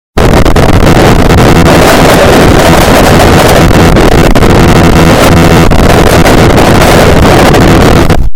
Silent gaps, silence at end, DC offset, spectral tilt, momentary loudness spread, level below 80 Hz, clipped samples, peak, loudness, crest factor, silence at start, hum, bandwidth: none; 0 s; under 0.1%; -5.5 dB/octave; 2 LU; -10 dBFS; 20%; 0 dBFS; -3 LUFS; 2 dB; 0.15 s; none; over 20 kHz